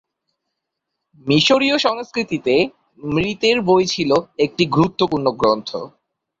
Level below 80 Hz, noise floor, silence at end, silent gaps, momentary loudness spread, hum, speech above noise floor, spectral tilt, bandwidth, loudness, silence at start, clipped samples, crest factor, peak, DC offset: -52 dBFS; -79 dBFS; 0.5 s; none; 10 LU; none; 61 dB; -5 dB/octave; 7.8 kHz; -17 LUFS; 1.25 s; under 0.1%; 16 dB; -2 dBFS; under 0.1%